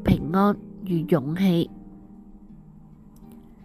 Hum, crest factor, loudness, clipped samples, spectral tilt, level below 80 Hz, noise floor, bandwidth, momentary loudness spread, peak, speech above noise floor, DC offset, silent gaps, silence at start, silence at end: none; 20 dB; -24 LUFS; under 0.1%; -8.5 dB/octave; -44 dBFS; -48 dBFS; 14.5 kHz; 13 LU; -6 dBFS; 26 dB; under 0.1%; none; 0 s; 0 s